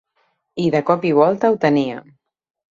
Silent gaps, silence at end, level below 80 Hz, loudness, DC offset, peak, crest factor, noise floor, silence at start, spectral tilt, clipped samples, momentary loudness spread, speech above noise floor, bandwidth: none; 0.7 s; -62 dBFS; -17 LUFS; under 0.1%; -2 dBFS; 16 dB; -66 dBFS; 0.55 s; -7.5 dB/octave; under 0.1%; 13 LU; 50 dB; 7.4 kHz